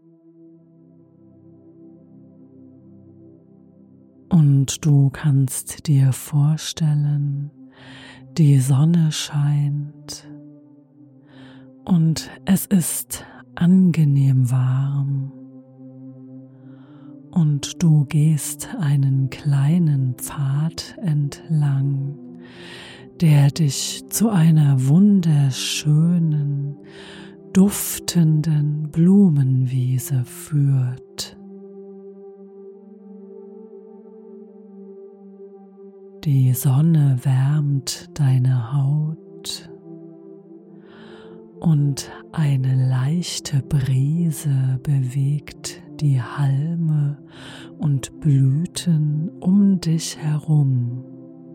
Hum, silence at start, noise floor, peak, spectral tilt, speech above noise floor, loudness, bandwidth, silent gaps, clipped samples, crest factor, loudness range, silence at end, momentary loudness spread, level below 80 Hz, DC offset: none; 4.3 s; -50 dBFS; -6 dBFS; -6.5 dB/octave; 32 dB; -19 LUFS; 16.5 kHz; none; under 0.1%; 16 dB; 7 LU; 0 s; 22 LU; -54 dBFS; under 0.1%